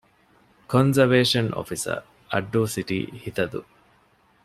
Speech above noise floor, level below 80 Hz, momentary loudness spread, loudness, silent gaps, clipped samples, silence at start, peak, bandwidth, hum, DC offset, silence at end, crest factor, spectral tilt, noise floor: 38 dB; -58 dBFS; 12 LU; -23 LUFS; none; under 0.1%; 0.7 s; -4 dBFS; 15 kHz; none; under 0.1%; 0.85 s; 20 dB; -5 dB/octave; -61 dBFS